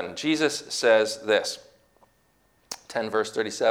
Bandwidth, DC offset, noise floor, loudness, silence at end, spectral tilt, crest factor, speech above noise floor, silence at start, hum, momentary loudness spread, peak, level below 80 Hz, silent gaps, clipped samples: 18 kHz; under 0.1%; -65 dBFS; -25 LUFS; 0 s; -2.5 dB/octave; 20 dB; 41 dB; 0 s; none; 15 LU; -6 dBFS; -70 dBFS; none; under 0.1%